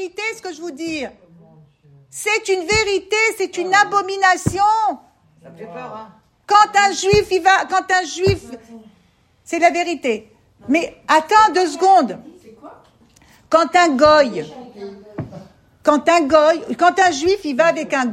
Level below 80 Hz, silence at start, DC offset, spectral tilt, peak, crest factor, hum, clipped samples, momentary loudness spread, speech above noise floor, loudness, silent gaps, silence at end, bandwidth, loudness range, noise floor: -48 dBFS; 0 s; under 0.1%; -3.5 dB/octave; 0 dBFS; 18 dB; none; under 0.1%; 20 LU; 40 dB; -16 LUFS; none; 0 s; 16 kHz; 4 LU; -57 dBFS